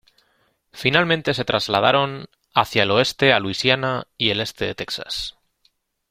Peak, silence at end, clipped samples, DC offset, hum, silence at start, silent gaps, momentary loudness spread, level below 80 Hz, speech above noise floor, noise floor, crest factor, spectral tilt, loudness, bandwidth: 0 dBFS; 0.8 s; under 0.1%; under 0.1%; none; 0.75 s; none; 10 LU; -52 dBFS; 45 dB; -65 dBFS; 22 dB; -4.5 dB/octave; -20 LUFS; 16 kHz